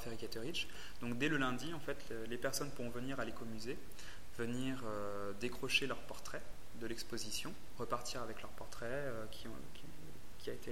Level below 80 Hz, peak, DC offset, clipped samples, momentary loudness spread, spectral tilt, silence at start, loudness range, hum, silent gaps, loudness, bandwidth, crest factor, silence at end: -58 dBFS; -20 dBFS; 1%; under 0.1%; 15 LU; -4 dB/octave; 0 s; 4 LU; none; none; -43 LUFS; 16.5 kHz; 22 dB; 0 s